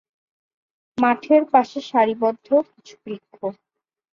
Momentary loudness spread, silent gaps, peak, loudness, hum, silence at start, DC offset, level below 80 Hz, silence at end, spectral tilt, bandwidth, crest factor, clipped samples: 19 LU; none; -4 dBFS; -19 LUFS; none; 0.95 s; under 0.1%; -70 dBFS; 0.6 s; -6 dB/octave; 7.4 kHz; 18 dB; under 0.1%